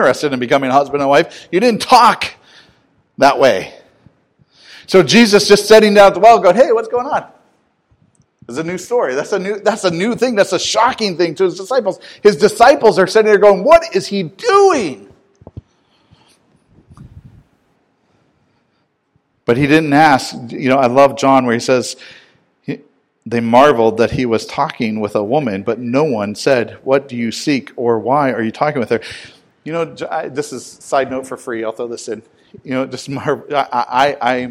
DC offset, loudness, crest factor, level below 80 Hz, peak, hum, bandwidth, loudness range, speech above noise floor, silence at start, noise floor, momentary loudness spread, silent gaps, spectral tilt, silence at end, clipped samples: under 0.1%; -13 LUFS; 14 dB; -50 dBFS; 0 dBFS; none; 15.5 kHz; 10 LU; 50 dB; 0 s; -63 dBFS; 15 LU; none; -4.5 dB/octave; 0 s; 0.7%